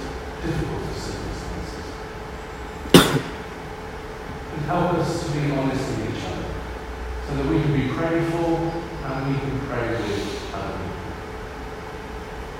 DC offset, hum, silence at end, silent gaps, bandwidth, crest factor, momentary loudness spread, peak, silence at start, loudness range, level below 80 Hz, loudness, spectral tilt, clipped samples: under 0.1%; none; 0 s; none; 16 kHz; 24 dB; 13 LU; 0 dBFS; 0 s; 5 LU; -38 dBFS; -25 LUFS; -5.5 dB/octave; under 0.1%